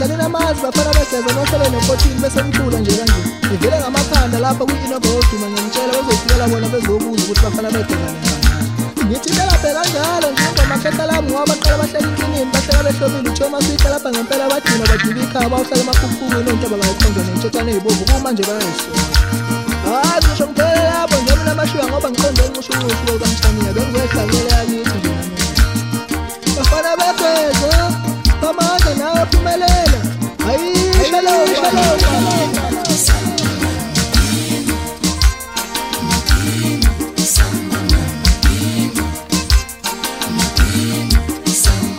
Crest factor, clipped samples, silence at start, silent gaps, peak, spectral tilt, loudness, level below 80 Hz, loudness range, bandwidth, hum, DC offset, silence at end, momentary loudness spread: 14 dB; under 0.1%; 0 s; none; 0 dBFS; -4 dB/octave; -15 LUFS; -20 dBFS; 2 LU; 16.5 kHz; none; under 0.1%; 0 s; 5 LU